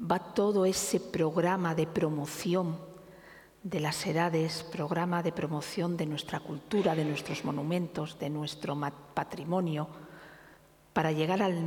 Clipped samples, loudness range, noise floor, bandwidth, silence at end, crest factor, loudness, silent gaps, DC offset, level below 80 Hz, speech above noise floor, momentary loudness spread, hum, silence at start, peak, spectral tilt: under 0.1%; 4 LU; -59 dBFS; 19 kHz; 0 s; 20 dB; -32 LUFS; none; under 0.1%; -66 dBFS; 28 dB; 9 LU; none; 0 s; -12 dBFS; -5.5 dB/octave